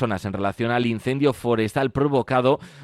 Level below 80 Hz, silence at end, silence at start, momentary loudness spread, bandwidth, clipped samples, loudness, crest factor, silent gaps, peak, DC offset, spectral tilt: -52 dBFS; 0 s; 0 s; 5 LU; 13.5 kHz; under 0.1%; -22 LUFS; 16 dB; none; -6 dBFS; under 0.1%; -7 dB/octave